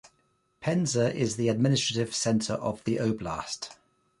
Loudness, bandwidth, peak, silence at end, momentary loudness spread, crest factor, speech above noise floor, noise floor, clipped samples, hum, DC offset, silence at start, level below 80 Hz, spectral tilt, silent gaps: -28 LUFS; 11.5 kHz; -12 dBFS; 0.45 s; 10 LU; 16 dB; 43 dB; -71 dBFS; under 0.1%; none; under 0.1%; 0.6 s; -58 dBFS; -5 dB/octave; none